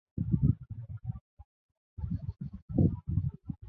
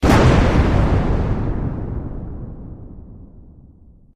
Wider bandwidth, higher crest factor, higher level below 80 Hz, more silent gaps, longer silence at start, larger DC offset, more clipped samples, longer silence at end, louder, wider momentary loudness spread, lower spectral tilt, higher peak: second, 1.8 kHz vs 14 kHz; about the same, 20 dB vs 16 dB; second, -44 dBFS vs -22 dBFS; first, 1.21-1.37 s, 1.45-1.69 s, 1.77-1.97 s, 2.62-2.68 s vs none; first, 0.15 s vs 0 s; neither; neither; second, 0 s vs 0.75 s; second, -33 LUFS vs -18 LUFS; second, 15 LU vs 24 LU; first, -14 dB/octave vs -7 dB/octave; second, -14 dBFS vs -2 dBFS